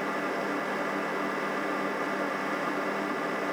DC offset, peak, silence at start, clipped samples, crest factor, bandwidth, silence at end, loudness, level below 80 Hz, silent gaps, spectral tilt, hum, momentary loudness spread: under 0.1%; -18 dBFS; 0 s; under 0.1%; 14 dB; over 20 kHz; 0 s; -30 LUFS; -76 dBFS; none; -4.5 dB/octave; none; 0 LU